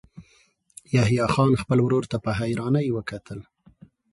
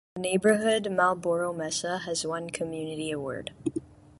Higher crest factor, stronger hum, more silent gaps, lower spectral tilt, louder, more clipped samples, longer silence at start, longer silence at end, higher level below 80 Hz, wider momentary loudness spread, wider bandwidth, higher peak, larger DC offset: about the same, 18 dB vs 18 dB; neither; neither; first, -7 dB/octave vs -4 dB/octave; first, -23 LUFS vs -28 LUFS; neither; about the same, 0.15 s vs 0.15 s; first, 0.7 s vs 0.25 s; first, -50 dBFS vs -62 dBFS; first, 15 LU vs 11 LU; about the same, 11.5 kHz vs 11.5 kHz; first, -6 dBFS vs -10 dBFS; neither